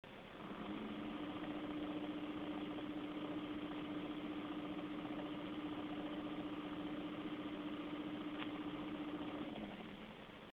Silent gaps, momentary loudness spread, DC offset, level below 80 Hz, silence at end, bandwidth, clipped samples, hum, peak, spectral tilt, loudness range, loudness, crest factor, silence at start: none; 3 LU; under 0.1%; -70 dBFS; 0.05 s; 6.4 kHz; under 0.1%; none; -28 dBFS; -7 dB/octave; 1 LU; -47 LUFS; 18 dB; 0.05 s